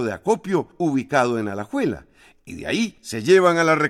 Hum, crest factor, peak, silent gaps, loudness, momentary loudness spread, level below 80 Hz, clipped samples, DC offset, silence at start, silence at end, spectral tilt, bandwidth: none; 16 dB; -4 dBFS; none; -21 LUFS; 12 LU; -56 dBFS; under 0.1%; under 0.1%; 0 s; 0 s; -5.5 dB/octave; 14 kHz